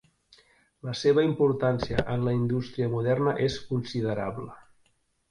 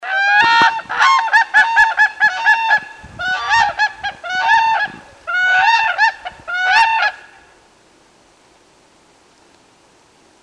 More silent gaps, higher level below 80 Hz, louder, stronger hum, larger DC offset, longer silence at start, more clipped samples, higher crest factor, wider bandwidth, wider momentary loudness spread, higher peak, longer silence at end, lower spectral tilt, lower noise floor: neither; about the same, -52 dBFS vs -54 dBFS; second, -27 LUFS vs -13 LUFS; neither; neither; first, 0.85 s vs 0 s; neither; about the same, 18 dB vs 14 dB; about the same, 10.5 kHz vs 10.5 kHz; about the same, 12 LU vs 11 LU; second, -8 dBFS vs -2 dBFS; second, 0.7 s vs 3.25 s; first, -7 dB/octave vs -0.5 dB/octave; first, -69 dBFS vs -51 dBFS